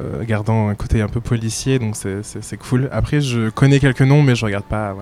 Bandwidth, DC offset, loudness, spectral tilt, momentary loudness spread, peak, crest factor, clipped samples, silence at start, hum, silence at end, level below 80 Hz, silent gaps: 13 kHz; under 0.1%; -18 LUFS; -6.5 dB/octave; 11 LU; -2 dBFS; 16 dB; under 0.1%; 0 s; none; 0 s; -32 dBFS; none